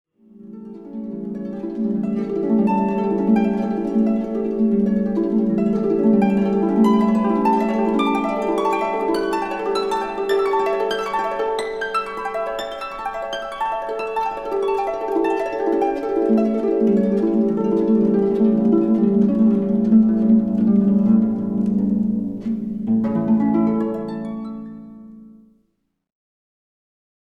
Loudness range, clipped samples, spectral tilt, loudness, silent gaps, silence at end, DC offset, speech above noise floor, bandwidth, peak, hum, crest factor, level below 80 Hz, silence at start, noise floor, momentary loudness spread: 7 LU; under 0.1%; -8 dB/octave; -19 LUFS; none; 2 s; 0.3%; 50 dB; 11 kHz; -4 dBFS; none; 14 dB; -52 dBFS; 0.35 s; -69 dBFS; 11 LU